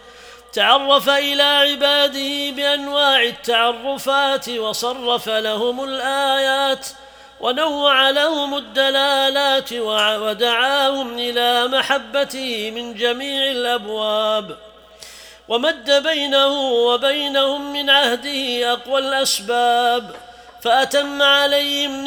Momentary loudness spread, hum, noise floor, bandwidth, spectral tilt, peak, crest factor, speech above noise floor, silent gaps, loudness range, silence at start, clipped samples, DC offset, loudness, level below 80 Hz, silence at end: 8 LU; none; -42 dBFS; over 20 kHz; -1 dB/octave; 0 dBFS; 18 dB; 24 dB; none; 4 LU; 0.05 s; under 0.1%; under 0.1%; -17 LUFS; -58 dBFS; 0 s